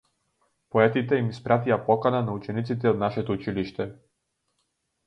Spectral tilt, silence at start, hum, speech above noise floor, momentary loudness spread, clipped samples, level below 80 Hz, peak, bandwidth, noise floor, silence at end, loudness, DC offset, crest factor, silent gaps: -8.5 dB/octave; 0.75 s; none; 52 dB; 9 LU; under 0.1%; -58 dBFS; -4 dBFS; 7.8 kHz; -77 dBFS; 1.15 s; -25 LUFS; under 0.1%; 22 dB; none